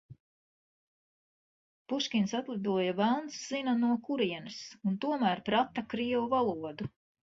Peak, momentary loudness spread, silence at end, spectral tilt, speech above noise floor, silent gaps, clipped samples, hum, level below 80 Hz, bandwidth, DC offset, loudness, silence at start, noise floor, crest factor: -14 dBFS; 9 LU; 0.35 s; -5.5 dB/octave; over 59 dB; 0.20-1.85 s; under 0.1%; none; -70 dBFS; 7.8 kHz; under 0.1%; -32 LUFS; 0.1 s; under -90 dBFS; 18 dB